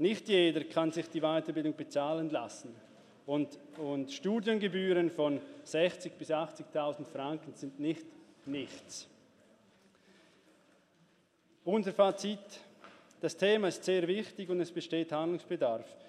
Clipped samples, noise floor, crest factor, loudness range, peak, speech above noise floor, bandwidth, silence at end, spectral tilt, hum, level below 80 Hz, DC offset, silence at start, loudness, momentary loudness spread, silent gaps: under 0.1%; -69 dBFS; 20 dB; 11 LU; -14 dBFS; 36 dB; 12 kHz; 0 s; -5 dB/octave; none; -88 dBFS; under 0.1%; 0 s; -34 LUFS; 15 LU; none